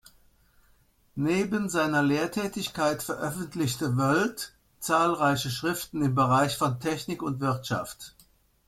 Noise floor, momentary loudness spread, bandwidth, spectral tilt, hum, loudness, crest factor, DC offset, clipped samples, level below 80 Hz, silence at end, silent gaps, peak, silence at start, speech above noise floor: -63 dBFS; 9 LU; 16.5 kHz; -5 dB/octave; none; -27 LUFS; 18 dB; under 0.1%; under 0.1%; -60 dBFS; 0.6 s; none; -10 dBFS; 1.15 s; 36 dB